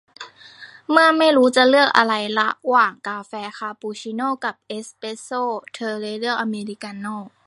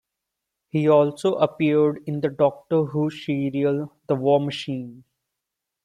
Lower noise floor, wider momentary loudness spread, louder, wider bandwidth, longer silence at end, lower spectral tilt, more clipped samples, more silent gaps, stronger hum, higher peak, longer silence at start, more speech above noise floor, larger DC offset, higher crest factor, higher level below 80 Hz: second, -44 dBFS vs -84 dBFS; first, 18 LU vs 10 LU; first, -19 LUFS vs -22 LUFS; about the same, 11.5 kHz vs 11 kHz; second, 0.2 s vs 0.85 s; second, -3.5 dB/octave vs -7.5 dB/octave; neither; neither; neither; first, 0 dBFS vs -4 dBFS; second, 0.2 s vs 0.75 s; second, 23 dB vs 62 dB; neither; about the same, 20 dB vs 18 dB; second, -76 dBFS vs -66 dBFS